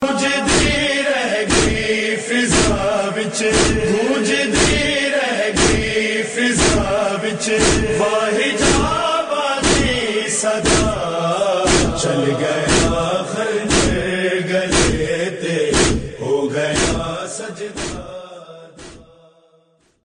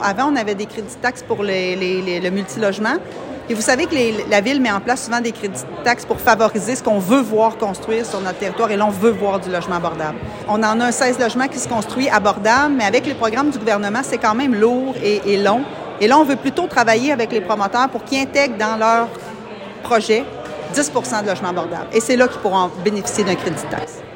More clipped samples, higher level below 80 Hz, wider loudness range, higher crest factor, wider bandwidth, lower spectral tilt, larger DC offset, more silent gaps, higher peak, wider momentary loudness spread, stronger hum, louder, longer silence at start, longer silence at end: neither; first, -30 dBFS vs -52 dBFS; about the same, 4 LU vs 3 LU; about the same, 16 dB vs 18 dB; second, 10.5 kHz vs 16.5 kHz; about the same, -3.5 dB/octave vs -4 dB/octave; neither; neither; about the same, -2 dBFS vs 0 dBFS; second, 6 LU vs 9 LU; neither; about the same, -17 LUFS vs -18 LUFS; about the same, 0 s vs 0 s; first, 1.05 s vs 0 s